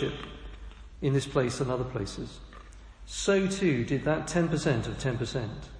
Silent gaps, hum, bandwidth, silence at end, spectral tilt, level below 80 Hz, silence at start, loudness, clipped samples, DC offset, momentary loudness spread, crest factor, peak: none; none; 10.5 kHz; 0 s; -5.5 dB/octave; -46 dBFS; 0 s; -29 LUFS; under 0.1%; under 0.1%; 20 LU; 18 dB; -12 dBFS